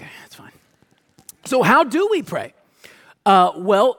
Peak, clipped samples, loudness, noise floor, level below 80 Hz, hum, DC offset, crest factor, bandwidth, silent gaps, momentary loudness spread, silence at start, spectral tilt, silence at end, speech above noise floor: -2 dBFS; under 0.1%; -17 LUFS; -60 dBFS; -66 dBFS; none; under 0.1%; 18 dB; 18 kHz; none; 21 LU; 0 s; -5 dB/octave; 0.05 s; 44 dB